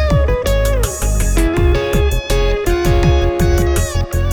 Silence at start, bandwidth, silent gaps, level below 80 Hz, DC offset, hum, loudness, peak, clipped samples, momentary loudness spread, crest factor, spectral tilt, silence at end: 0 s; 19.5 kHz; none; -16 dBFS; under 0.1%; none; -15 LUFS; 0 dBFS; under 0.1%; 4 LU; 12 dB; -5.5 dB/octave; 0 s